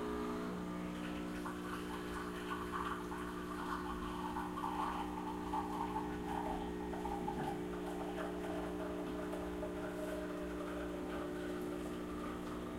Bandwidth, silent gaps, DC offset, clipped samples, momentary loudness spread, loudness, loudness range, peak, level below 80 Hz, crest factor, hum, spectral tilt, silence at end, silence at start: 16 kHz; none; under 0.1%; under 0.1%; 3 LU; -42 LUFS; 2 LU; -26 dBFS; -56 dBFS; 16 dB; 60 Hz at -50 dBFS; -6 dB/octave; 0 s; 0 s